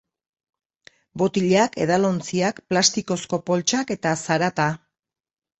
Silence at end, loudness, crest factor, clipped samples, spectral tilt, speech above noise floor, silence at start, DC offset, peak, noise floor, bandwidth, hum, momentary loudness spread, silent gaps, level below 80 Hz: 0.85 s; -22 LUFS; 20 dB; under 0.1%; -4 dB/octave; 34 dB; 1.15 s; under 0.1%; -2 dBFS; -55 dBFS; 8.4 kHz; none; 7 LU; none; -62 dBFS